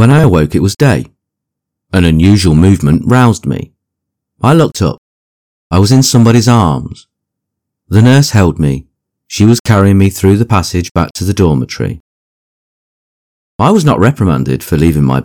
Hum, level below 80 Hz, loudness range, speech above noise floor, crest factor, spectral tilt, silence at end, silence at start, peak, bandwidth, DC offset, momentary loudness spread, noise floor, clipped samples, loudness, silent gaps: none; -30 dBFS; 4 LU; 69 dB; 10 dB; -6.5 dB/octave; 0 s; 0 s; 0 dBFS; 18 kHz; under 0.1%; 11 LU; -77 dBFS; 2%; -10 LUFS; 4.98-5.70 s, 9.60-9.65 s, 10.91-10.95 s, 11.11-11.15 s, 12.00-13.59 s